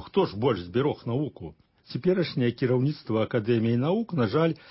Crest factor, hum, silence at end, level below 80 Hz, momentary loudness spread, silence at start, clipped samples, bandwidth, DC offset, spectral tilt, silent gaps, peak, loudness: 16 dB; none; 0.15 s; -56 dBFS; 6 LU; 0 s; under 0.1%; 5.8 kHz; under 0.1%; -11.5 dB/octave; none; -10 dBFS; -26 LUFS